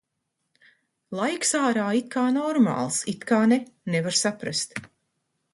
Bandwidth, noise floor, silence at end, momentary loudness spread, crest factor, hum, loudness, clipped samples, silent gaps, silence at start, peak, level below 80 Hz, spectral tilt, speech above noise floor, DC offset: 11.5 kHz; -79 dBFS; 0.7 s; 7 LU; 18 dB; none; -24 LUFS; under 0.1%; none; 1.1 s; -8 dBFS; -70 dBFS; -3.5 dB/octave; 55 dB; under 0.1%